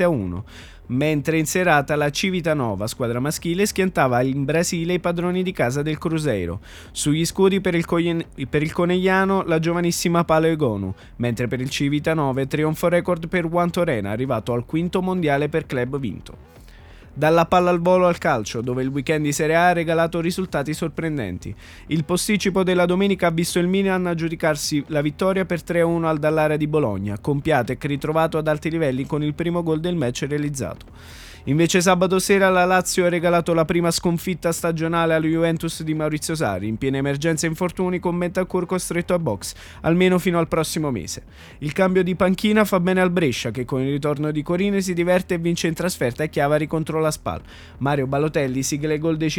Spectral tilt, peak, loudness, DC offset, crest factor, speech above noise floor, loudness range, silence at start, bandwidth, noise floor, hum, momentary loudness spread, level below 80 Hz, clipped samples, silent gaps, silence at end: -5.5 dB/octave; -2 dBFS; -21 LUFS; under 0.1%; 20 dB; 23 dB; 3 LU; 0 s; 19 kHz; -43 dBFS; none; 8 LU; -46 dBFS; under 0.1%; none; 0 s